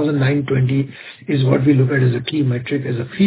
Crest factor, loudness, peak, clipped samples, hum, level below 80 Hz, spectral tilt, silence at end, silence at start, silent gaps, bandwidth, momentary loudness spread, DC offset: 16 dB; -18 LUFS; 0 dBFS; under 0.1%; none; -52 dBFS; -12 dB/octave; 0 s; 0 s; none; 4 kHz; 8 LU; under 0.1%